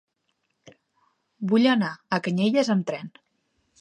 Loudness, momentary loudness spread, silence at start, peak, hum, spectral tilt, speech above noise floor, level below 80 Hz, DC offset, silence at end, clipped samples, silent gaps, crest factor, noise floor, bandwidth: -23 LUFS; 14 LU; 1.4 s; -8 dBFS; none; -6 dB/octave; 52 dB; -76 dBFS; under 0.1%; 0.7 s; under 0.1%; none; 18 dB; -75 dBFS; 10 kHz